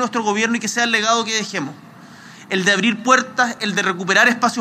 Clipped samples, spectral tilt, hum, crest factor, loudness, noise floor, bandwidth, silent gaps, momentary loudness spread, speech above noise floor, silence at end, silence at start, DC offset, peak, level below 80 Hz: under 0.1%; -2.5 dB/octave; none; 18 dB; -17 LUFS; -41 dBFS; 15.5 kHz; none; 8 LU; 23 dB; 0 s; 0 s; under 0.1%; 0 dBFS; -74 dBFS